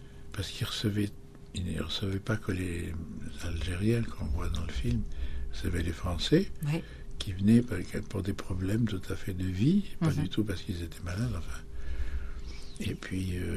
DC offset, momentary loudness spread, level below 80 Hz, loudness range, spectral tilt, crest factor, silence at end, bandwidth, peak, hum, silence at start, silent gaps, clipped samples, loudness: under 0.1%; 13 LU; -40 dBFS; 4 LU; -6.5 dB/octave; 20 dB; 0 s; 13.5 kHz; -12 dBFS; none; 0 s; none; under 0.1%; -33 LUFS